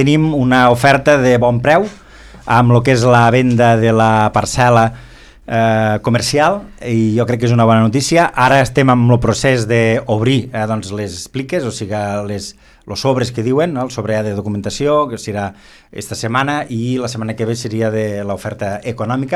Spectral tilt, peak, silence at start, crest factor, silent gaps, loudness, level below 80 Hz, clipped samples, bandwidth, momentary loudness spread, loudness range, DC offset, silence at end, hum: -6 dB/octave; 0 dBFS; 0 s; 14 dB; none; -14 LUFS; -40 dBFS; under 0.1%; 13 kHz; 12 LU; 7 LU; under 0.1%; 0 s; none